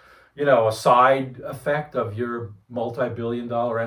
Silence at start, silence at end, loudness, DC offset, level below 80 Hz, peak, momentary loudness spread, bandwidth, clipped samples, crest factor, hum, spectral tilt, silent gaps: 0.35 s; 0 s; -22 LUFS; under 0.1%; -62 dBFS; -4 dBFS; 14 LU; 19 kHz; under 0.1%; 18 dB; none; -6 dB/octave; none